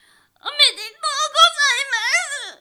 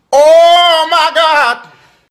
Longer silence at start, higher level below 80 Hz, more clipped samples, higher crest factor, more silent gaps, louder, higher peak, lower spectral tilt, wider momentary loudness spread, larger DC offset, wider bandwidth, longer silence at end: first, 0.45 s vs 0.1 s; second, -64 dBFS vs -56 dBFS; neither; first, 16 dB vs 8 dB; neither; second, -16 LUFS vs -7 LUFS; about the same, -2 dBFS vs 0 dBFS; second, 4.5 dB/octave vs 0 dB/octave; first, 14 LU vs 8 LU; neither; first, over 20 kHz vs 15 kHz; second, 0.05 s vs 0.5 s